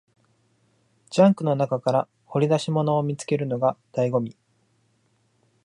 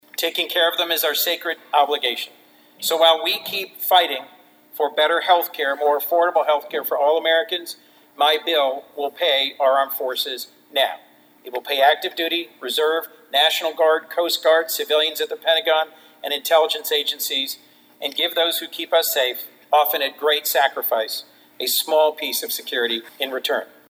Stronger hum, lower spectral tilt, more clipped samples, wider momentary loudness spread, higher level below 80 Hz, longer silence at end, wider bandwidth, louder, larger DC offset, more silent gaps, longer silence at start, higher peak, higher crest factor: neither; first, -7 dB/octave vs 0.5 dB/octave; neither; about the same, 8 LU vs 10 LU; first, -72 dBFS vs -88 dBFS; first, 1.35 s vs 0.25 s; second, 11 kHz vs over 20 kHz; second, -23 LUFS vs -20 LUFS; neither; neither; first, 1.1 s vs 0.2 s; second, -4 dBFS vs 0 dBFS; about the same, 20 dB vs 20 dB